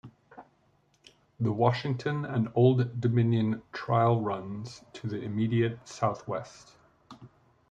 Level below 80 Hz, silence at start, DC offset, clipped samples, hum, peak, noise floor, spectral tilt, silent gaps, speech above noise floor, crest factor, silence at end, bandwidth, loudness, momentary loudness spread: -66 dBFS; 0.05 s; under 0.1%; under 0.1%; none; -8 dBFS; -68 dBFS; -8 dB/octave; none; 40 dB; 20 dB; 0.45 s; 7.8 kHz; -29 LUFS; 13 LU